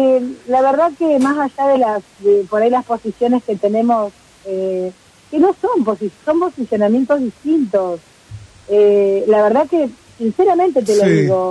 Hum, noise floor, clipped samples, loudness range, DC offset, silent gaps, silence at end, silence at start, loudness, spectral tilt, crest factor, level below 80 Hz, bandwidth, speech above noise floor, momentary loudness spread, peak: none; -37 dBFS; under 0.1%; 3 LU; under 0.1%; none; 0 s; 0 s; -15 LUFS; -7 dB/octave; 12 dB; -56 dBFS; 11 kHz; 22 dB; 10 LU; -2 dBFS